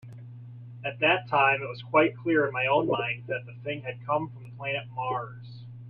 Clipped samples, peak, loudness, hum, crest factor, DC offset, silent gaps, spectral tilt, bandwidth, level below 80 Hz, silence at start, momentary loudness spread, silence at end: under 0.1%; -8 dBFS; -27 LUFS; none; 20 dB; under 0.1%; none; -8.5 dB/octave; 5.2 kHz; -68 dBFS; 0.05 s; 21 LU; 0 s